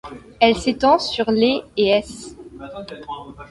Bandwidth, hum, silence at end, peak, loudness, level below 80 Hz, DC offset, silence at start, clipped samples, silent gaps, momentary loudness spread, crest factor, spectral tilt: 11.5 kHz; none; 0.05 s; 0 dBFS; -18 LUFS; -48 dBFS; under 0.1%; 0.05 s; under 0.1%; none; 19 LU; 20 dB; -4.5 dB/octave